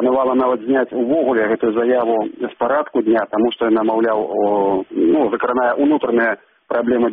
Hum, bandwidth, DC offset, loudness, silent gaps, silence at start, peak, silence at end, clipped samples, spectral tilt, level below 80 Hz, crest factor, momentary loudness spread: none; 3.9 kHz; under 0.1%; -17 LUFS; none; 0 s; -6 dBFS; 0 s; under 0.1%; -4 dB/octave; -58 dBFS; 10 dB; 4 LU